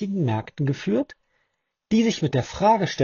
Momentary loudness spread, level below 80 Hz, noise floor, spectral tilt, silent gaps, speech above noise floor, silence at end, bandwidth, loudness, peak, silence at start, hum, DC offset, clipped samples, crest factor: 6 LU; -54 dBFS; -75 dBFS; -6 dB/octave; none; 53 dB; 0 s; 7.2 kHz; -23 LUFS; -6 dBFS; 0 s; none; under 0.1%; under 0.1%; 16 dB